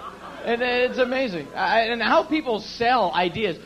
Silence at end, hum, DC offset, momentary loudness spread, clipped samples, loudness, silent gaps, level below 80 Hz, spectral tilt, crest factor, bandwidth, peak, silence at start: 0 s; none; under 0.1%; 8 LU; under 0.1%; -22 LUFS; none; -54 dBFS; -5 dB/octave; 16 dB; 13 kHz; -6 dBFS; 0 s